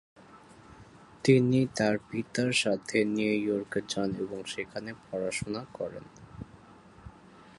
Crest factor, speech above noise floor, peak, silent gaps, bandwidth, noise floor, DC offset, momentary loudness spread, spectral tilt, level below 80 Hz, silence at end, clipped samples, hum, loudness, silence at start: 22 dB; 25 dB; -8 dBFS; none; 11.5 kHz; -54 dBFS; under 0.1%; 19 LU; -5 dB/octave; -62 dBFS; 0.5 s; under 0.1%; none; -30 LUFS; 0.35 s